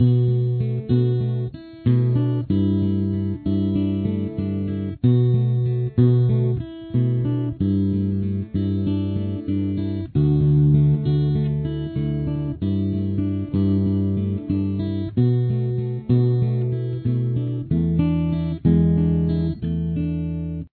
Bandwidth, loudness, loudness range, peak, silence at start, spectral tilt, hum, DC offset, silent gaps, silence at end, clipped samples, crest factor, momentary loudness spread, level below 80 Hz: 4.5 kHz; -22 LUFS; 2 LU; -6 dBFS; 0 s; -13 dB/octave; none; under 0.1%; none; 0.05 s; under 0.1%; 14 dB; 7 LU; -40 dBFS